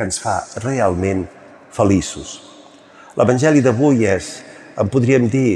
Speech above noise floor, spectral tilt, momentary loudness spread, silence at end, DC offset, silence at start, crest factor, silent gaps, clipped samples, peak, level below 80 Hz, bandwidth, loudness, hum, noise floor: 27 dB; -6 dB/octave; 19 LU; 0 s; under 0.1%; 0 s; 16 dB; none; under 0.1%; -2 dBFS; -50 dBFS; 12 kHz; -17 LUFS; none; -43 dBFS